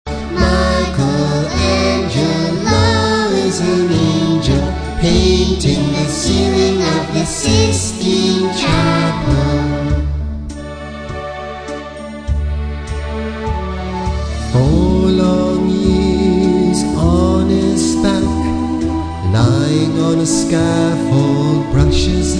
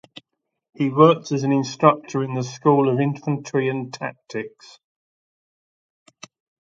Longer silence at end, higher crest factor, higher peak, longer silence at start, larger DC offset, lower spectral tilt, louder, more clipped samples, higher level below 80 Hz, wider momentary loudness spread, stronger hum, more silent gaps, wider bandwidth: second, 0 s vs 2.15 s; second, 14 dB vs 22 dB; about the same, 0 dBFS vs 0 dBFS; second, 0.05 s vs 0.8 s; neither; second, -5.5 dB/octave vs -7 dB/octave; first, -15 LUFS vs -21 LUFS; neither; first, -24 dBFS vs -68 dBFS; second, 10 LU vs 16 LU; neither; neither; first, 10.5 kHz vs 7.8 kHz